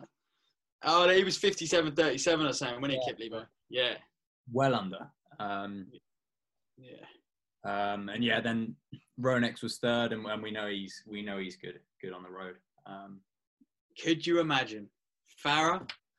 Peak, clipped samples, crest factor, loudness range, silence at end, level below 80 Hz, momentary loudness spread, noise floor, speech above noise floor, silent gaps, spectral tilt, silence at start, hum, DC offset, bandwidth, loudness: -12 dBFS; under 0.1%; 20 dB; 12 LU; 0.25 s; -70 dBFS; 19 LU; under -90 dBFS; over 59 dB; 0.72-0.79 s, 4.27-4.44 s, 13.47-13.57 s, 13.81-13.89 s; -4 dB/octave; 0 s; none; under 0.1%; 12 kHz; -31 LUFS